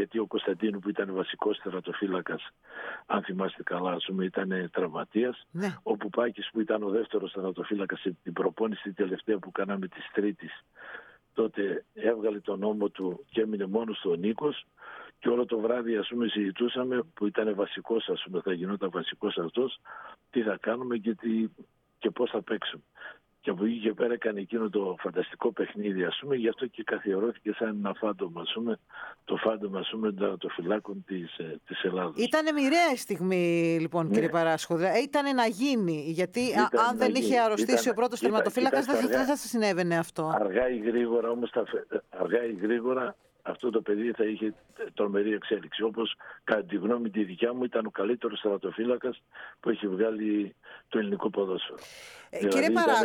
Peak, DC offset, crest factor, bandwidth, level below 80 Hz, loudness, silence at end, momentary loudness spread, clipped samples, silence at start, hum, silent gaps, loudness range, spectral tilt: -10 dBFS; under 0.1%; 20 dB; 18.5 kHz; -72 dBFS; -30 LUFS; 0 s; 10 LU; under 0.1%; 0 s; none; none; 6 LU; -5 dB/octave